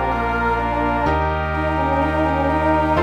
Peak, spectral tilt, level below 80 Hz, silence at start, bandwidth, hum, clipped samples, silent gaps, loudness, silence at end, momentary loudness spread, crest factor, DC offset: -4 dBFS; -8 dB/octave; -28 dBFS; 0 s; 9.4 kHz; none; under 0.1%; none; -19 LUFS; 0 s; 3 LU; 14 dB; under 0.1%